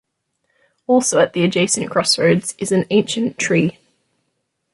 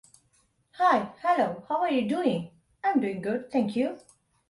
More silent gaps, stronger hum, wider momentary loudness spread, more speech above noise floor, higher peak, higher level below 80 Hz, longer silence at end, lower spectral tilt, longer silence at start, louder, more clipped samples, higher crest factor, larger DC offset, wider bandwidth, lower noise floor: neither; neither; second, 5 LU vs 8 LU; first, 55 dB vs 42 dB; first, -2 dBFS vs -10 dBFS; first, -60 dBFS vs -70 dBFS; first, 1 s vs 0.5 s; second, -4 dB/octave vs -6.5 dB/octave; first, 0.9 s vs 0.75 s; first, -17 LUFS vs -27 LUFS; neither; about the same, 16 dB vs 18 dB; neither; about the same, 11.5 kHz vs 11.5 kHz; first, -72 dBFS vs -68 dBFS